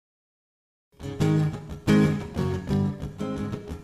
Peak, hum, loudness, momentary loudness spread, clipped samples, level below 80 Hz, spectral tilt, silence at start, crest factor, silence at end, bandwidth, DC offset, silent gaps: -8 dBFS; none; -26 LUFS; 12 LU; under 0.1%; -44 dBFS; -7.5 dB/octave; 1 s; 20 dB; 0 s; 13 kHz; under 0.1%; none